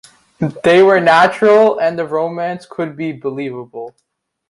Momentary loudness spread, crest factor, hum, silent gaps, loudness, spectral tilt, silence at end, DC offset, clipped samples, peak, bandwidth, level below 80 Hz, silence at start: 17 LU; 14 dB; none; none; -14 LUFS; -6 dB/octave; 0.6 s; under 0.1%; under 0.1%; 0 dBFS; 11.5 kHz; -58 dBFS; 0.4 s